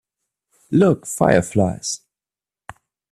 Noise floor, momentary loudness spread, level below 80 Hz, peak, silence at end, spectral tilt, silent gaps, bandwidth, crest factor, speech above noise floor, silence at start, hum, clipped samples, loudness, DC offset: under -90 dBFS; 10 LU; -52 dBFS; 0 dBFS; 1.15 s; -5.5 dB/octave; none; 13.5 kHz; 20 dB; over 73 dB; 0.7 s; none; under 0.1%; -18 LUFS; under 0.1%